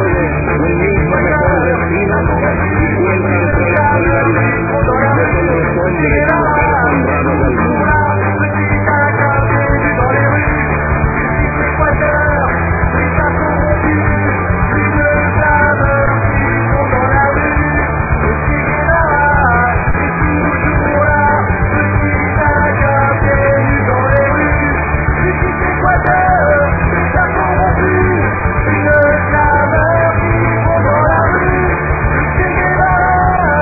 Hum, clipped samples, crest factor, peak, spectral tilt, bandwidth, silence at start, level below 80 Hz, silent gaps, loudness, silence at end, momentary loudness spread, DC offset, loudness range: none; under 0.1%; 12 dB; 0 dBFS; -13.5 dB/octave; 2.6 kHz; 0 s; -22 dBFS; none; -12 LUFS; 0 s; 3 LU; under 0.1%; 1 LU